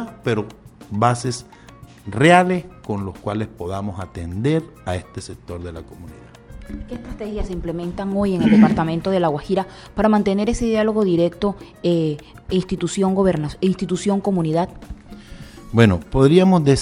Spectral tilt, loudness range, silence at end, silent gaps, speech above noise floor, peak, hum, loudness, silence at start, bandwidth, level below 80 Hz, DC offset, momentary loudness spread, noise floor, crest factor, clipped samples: -6.5 dB/octave; 10 LU; 0 s; none; 24 dB; -2 dBFS; none; -19 LUFS; 0 s; 11.5 kHz; -38 dBFS; under 0.1%; 20 LU; -43 dBFS; 18 dB; under 0.1%